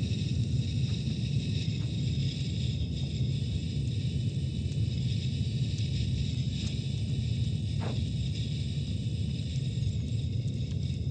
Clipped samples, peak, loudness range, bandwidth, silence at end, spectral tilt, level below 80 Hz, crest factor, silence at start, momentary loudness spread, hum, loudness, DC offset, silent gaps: under 0.1%; -18 dBFS; 1 LU; 9 kHz; 0 s; -6.5 dB/octave; -42 dBFS; 12 dB; 0 s; 2 LU; none; -32 LUFS; under 0.1%; none